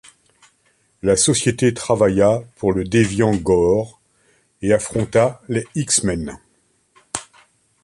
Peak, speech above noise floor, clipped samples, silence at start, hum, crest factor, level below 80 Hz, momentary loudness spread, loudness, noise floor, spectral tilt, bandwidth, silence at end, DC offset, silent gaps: -2 dBFS; 45 dB; under 0.1%; 1.05 s; none; 16 dB; -44 dBFS; 13 LU; -18 LUFS; -62 dBFS; -4.5 dB/octave; 11.5 kHz; 0.6 s; under 0.1%; none